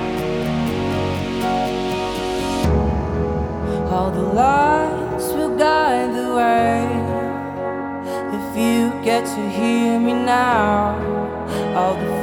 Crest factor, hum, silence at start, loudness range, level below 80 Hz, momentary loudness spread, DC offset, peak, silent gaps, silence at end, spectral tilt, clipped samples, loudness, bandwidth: 14 dB; none; 0 s; 3 LU; -34 dBFS; 8 LU; under 0.1%; -4 dBFS; none; 0 s; -6 dB/octave; under 0.1%; -19 LUFS; 19 kHz